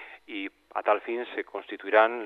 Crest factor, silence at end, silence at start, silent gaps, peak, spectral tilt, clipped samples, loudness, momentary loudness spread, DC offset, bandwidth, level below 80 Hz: 22 dB; 0 s; 0 s; none; -6 dBFS; -5 dB/octave; under 0.1%; -29 LUFS; 14 LU; under 0.1%; 4.9 kHz; -78 dBFS